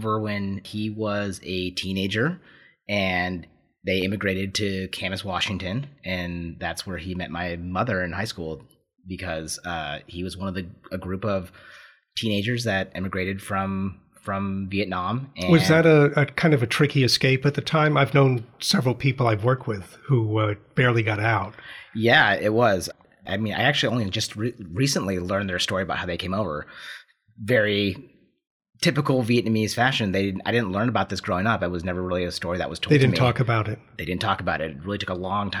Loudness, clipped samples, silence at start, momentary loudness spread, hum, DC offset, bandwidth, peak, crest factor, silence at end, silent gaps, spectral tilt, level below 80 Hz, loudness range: -24 LUFS; under 0.1%; 0 s; 13 LU; none; under 0.1%; 15.5 kHz; -4 dBFS; 20 dB; 0 s; 28.47-28.60 s; -5.5 dB/octave; -56 dBFS; 9 LU